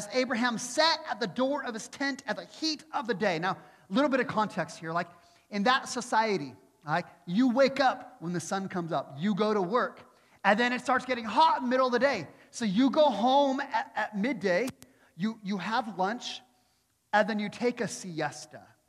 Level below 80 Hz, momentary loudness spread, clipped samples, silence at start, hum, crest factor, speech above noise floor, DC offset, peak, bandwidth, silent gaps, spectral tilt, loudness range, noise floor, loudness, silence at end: -76 dBFS; 11 LU; under 0.1%; 0 s; none; 22 dB; 43 dB; under 0.1%; -8 dBFS; 13.5 kHz; none; -4.5 dB/octave; 5 LU; -71 dBFS; -29 LUFS; 0.3 s